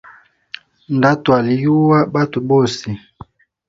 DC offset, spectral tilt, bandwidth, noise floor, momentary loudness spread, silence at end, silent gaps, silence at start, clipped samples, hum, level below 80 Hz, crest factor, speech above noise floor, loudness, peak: under 0.1%; -7 dB/octave; 7.8 kHz; -46 dBFS; 22 LU; 0.7 s; none; 0.9 s; under 0.1%; none; -52 dBFS; 16 dB; 31 dB; -15 LUFS; 0 dBFS